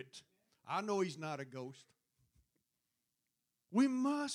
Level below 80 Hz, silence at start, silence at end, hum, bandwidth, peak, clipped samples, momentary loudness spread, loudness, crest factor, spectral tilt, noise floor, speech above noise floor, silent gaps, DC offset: -88 dBFS; 0 s; 0 s; none; 11.5 kHz; -22 dBFS; under 0.1%; 18 LU; -38 LUFS; 18 dB; -5 dB/octave; -87 dBFS; 50 dB; none; under 0.1%